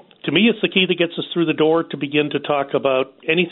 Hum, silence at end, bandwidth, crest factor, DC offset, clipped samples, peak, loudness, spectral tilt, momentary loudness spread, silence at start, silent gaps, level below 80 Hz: none; 0 s; 4.2 kHz; 16 dB; under 0.1%; under 0.1%; -2 dBFS; -19 LUFS; -3 dB/octave; 5 LU; 0.25 s; none; -64 dBFS